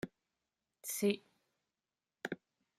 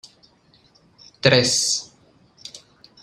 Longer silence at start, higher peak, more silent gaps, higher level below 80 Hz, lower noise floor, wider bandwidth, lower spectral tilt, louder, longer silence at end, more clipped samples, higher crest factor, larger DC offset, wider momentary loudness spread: second, 0.05 s vs 1.25 s; second, -18 dBFS vs -2 dBFS; neither; second, -80 dBFS vs -58 dBFS; first, under -90 dBFS vs -57 dBFS; about the same, 15.5 kHz vs 15 kHz; first, -4 dB/octave vs -2.5 dB/octave; second, -40 LUFS vs -18 LUFS; about the same, 0.45 s vs 0.45 s; neither; about the same, 24 dB vs 24 dB; neither; second, 14 LU vs 24 LU